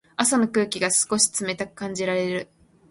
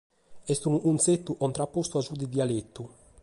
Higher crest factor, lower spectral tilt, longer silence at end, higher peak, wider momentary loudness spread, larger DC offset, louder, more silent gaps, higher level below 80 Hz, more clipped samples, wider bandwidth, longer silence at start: about the same, 20 dB vs 18 dB; second, -2.5 dB/octave vs -5.5 dB/octave; about the same, 0.45 s vs 0.35 s; first, -4 dBFS vs -12 dBFS; second, 10 LU vs 19 LU; neither; first, -22 LUFS vs -28 LUFS; neither; about the same, -64 dBFS vs -62 dBFS; neither; about the same, 12 kHz vs 11.5 kHz; about the same, 0.2 s vs 0.3 s